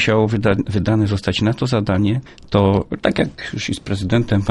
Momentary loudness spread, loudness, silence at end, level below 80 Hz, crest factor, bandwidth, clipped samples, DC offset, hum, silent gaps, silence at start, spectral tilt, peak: 7 LU; -18 LUFS; 0 s; -40 dBFS; 16 dB; 11.5 kHz; under 0.1%; under 0.1%; none; none; 0 s; -6.5 dB/octave; 0 dBFS